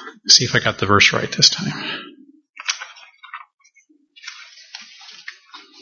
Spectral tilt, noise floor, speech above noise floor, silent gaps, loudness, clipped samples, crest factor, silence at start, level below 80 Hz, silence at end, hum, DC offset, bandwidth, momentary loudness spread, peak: -2 dB/octave; -57 dBFS; 40 dB; 2.49-2.53 s, 3.54-3.58 s; -15 LUFS; under 0.1%; 22 dB; 0 s; -56 dBFS; 0.25 s; none; under 0.1%; 11 kHz; 26 LU; 0 dBFS